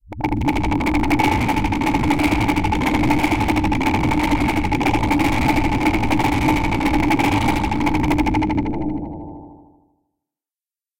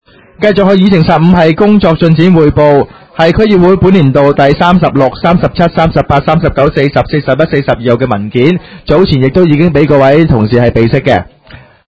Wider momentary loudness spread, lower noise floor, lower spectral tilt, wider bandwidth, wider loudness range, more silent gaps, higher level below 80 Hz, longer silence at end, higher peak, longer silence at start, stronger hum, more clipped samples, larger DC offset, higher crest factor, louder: about the same, 4 LU vs 5 LU; first, under -90 dBFS vs -35 dBFS; second, -6 dB/octave vs -9 dB/octave; first, 17 kHz vs 8 kHz; about the same, 3 LU vs 3 LU; neither; about the same, -30 dBFS vs -28 dBFS; first, 1.1 s vs 0.3 s; second, -4 dBFS vs 0 dBFS; second, 0.05 s vs 0.4 s; neither; second, under 0.1% vs 3%; second, under 0.1% vs 0.8%; first, 16 dB vs 8 dB; second, -19 LUFS vs -8 LUFS